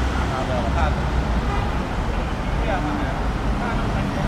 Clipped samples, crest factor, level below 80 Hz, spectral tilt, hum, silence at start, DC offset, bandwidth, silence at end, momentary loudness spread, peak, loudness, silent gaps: under 0.1%; 14 dB; -24 dBFS; -6.5 dB/octave; none; 0 s; under 0.1%; 11.5 kHz; 0 s; 3 LU; -8 dBFS; -23 LUFS; none